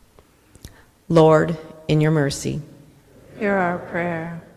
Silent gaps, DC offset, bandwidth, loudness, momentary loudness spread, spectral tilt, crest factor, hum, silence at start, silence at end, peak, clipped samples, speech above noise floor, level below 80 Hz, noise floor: none; under 0.1%; 13 kHz; -20 LUFS; 14 LU; -6.5 dB/octave; 20 dB; none; 0.65 s; 0.15 s; -2 dBFS; under 0.1%; 34 dB; -50 dBFS; -53 dBFS